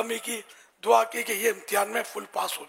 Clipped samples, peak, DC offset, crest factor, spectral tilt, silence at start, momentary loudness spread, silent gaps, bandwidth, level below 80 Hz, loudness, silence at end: under 0.1%; -6 dBFS; under 0.1%; 22 dB; -1 dB/octave; 0 s; 11 LU; none; 16 kHz; -86 dBFS; -27 LUFS; 0 s